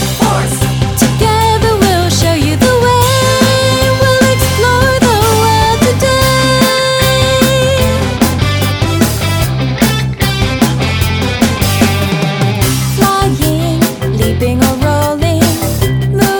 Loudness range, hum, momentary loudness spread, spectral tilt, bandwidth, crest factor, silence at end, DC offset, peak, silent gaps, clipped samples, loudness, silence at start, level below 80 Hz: 3 LU; none; 4 LU; -4.5 dB/octave; over 20 kHz; 10 dB; 0 s; under 0.1%; 0 dBFS; none; under 0.1%; -11 LUFS; 0 s; -24 dBFS